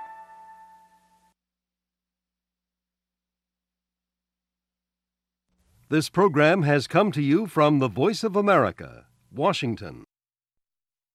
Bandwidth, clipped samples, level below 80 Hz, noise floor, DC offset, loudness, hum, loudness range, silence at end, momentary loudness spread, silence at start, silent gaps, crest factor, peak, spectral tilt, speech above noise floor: 14.5 kHz; under 0.1%; -66 dBFS; under -90 dBFS; under 0.1%; -22 LUFS; 60 Hz at -65 dBFS; 6 LU; 1.15 s; 21 LU; 0 s; none; 22 dB; -6 dBFS; -6.5 dB/octave; over 68 dB